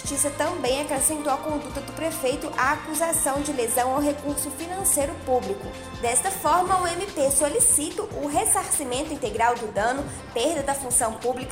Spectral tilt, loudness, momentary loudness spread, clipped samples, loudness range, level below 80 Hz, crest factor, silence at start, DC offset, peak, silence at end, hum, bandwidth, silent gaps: -2.5 dB/octave; -23 LUFS; 9 LU; under 0.1%; 3 LU; -46 dBFS; 16 dB; 0 s; under 0.1%; -8 dBFS; 0 s; none; 16 kHz; none